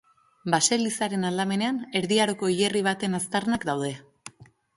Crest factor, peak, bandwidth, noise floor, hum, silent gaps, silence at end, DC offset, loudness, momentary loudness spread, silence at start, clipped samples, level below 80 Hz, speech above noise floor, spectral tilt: 20 dB; -6 dBFS; 11.5 kHz; -48 dBFS; none; none; 0.35 s; under 0.1%; -25 LUFS; 14 LU; 0.45 s; under 0.1%; -64 dBFS; 23 dB; -3.5 dB/octave